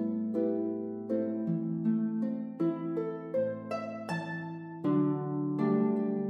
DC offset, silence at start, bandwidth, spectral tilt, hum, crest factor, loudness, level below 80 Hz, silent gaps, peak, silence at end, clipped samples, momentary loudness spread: under 0.1%; 0 s; 8.6 kHz; -9.5 dB/octave; none; 14 dB; -32 LUFS; -82 dBFS; none; -16 dBFS; 0 s; under 0.1%; 8 LU